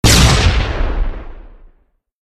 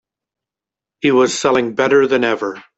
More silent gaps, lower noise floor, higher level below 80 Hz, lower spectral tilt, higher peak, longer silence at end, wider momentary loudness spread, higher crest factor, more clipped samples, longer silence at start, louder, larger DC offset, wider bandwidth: neither; second, -56 dBFS vs -87 dBFS; first, -18 dBFS vs -58 dBFS; about the same, -3.5 dB/octave vs -4 dB/octave; about the same, 0 dBFS vs -2 dBFS; first, 0.9 s vs 0.15 s; first, 17 LU vs 6 LU; about the same, 14 dB vs 14 dB; neither; second, 0.05 s vs 1.05 s; about the same, -14 LUFS vs -15 LUFS; neither; first, 15 kHz vs 8.2 kHz